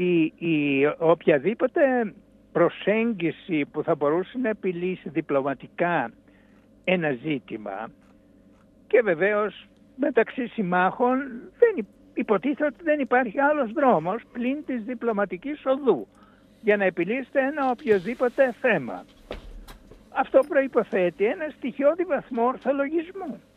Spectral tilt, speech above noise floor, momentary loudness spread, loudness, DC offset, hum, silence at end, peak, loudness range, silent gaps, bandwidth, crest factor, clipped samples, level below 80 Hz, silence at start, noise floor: -8 dB/octave; 31 dB; 10 LU; -24 LUFS; under 0.1%; none; 0.2 s; -4 dBFS; 4 LU; none; 9.8 kHz; 20 dB; under 0.1%; -58 dBFS; 0 s; -55 dBFS